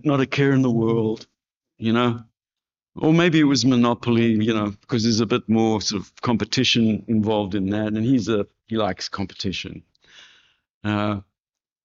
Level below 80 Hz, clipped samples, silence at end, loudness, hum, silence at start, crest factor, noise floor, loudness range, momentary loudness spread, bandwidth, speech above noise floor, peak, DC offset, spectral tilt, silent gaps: -56 dBFS; under 0.1%; 0.65 s; -21 LUFS; none; 0.05 s; 16 dB; under -90 dBFS; 6 LU; 10 LU; 7.6 kHz; over 70 dB; -6 dBFS; under 0.1%; -5 dB/octave; 10.70-10.81 s